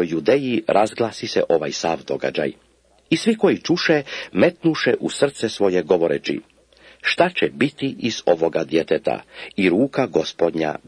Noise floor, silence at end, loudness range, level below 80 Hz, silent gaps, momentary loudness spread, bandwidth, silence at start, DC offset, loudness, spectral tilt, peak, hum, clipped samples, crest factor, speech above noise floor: -50 dBFS; 0.1 s; 2 LU; -58 dBFS; none; 6 LU; 10.5 kHz; 0 s; under 0.1%; -20 LUFS; -5 dB/octave; 0 dBFS; none; under 0.1%; 20 dB; 30 dB